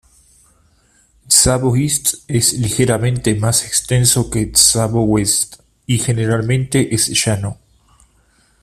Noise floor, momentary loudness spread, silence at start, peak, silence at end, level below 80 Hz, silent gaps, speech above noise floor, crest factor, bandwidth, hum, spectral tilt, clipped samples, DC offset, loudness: -55 dBFS; 7 LU; 1.3 s; 0 dBFS; 1.1 s; -38 dBFS; none; 40 dB; 16 dB; 16 kHz; none; -3.5 dB/octave; under 0.1%; under 0.1%; -14 LUFS